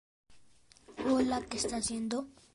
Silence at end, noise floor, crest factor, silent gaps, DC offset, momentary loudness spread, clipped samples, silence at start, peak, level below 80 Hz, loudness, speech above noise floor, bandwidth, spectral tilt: 0.25 s; -62 dBFS; 18 dB; none; under 0.1%; 8 LU; under 0.1%; 0.3 s; -18 dBFS; -60 dBFS; -33 LUFS; 27 dB; 11.5 kHz; -3.5 dB/octave